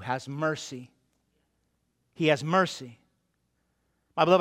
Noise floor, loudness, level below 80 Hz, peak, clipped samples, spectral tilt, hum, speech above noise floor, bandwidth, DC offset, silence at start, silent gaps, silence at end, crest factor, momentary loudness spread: -75 dBFS; -27 LUFS; -74 dBFS; -6 dBFS; under 0.1%; -5.5 dB/octave; none; 47 dB; 14.5 kHz; under 0.1%; 0 s; none; 0 s; 24 dB; 17 LU